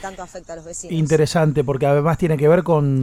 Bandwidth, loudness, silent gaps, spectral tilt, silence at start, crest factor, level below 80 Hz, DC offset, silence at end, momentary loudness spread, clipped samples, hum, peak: 13.5 kHz; -17 LUFS; none; -7 dB/octave; 0 s; 16 dB; -44 dBFS; under 0.1%; 0 s; 17 LU; under 0.1%; none; -2 dBFS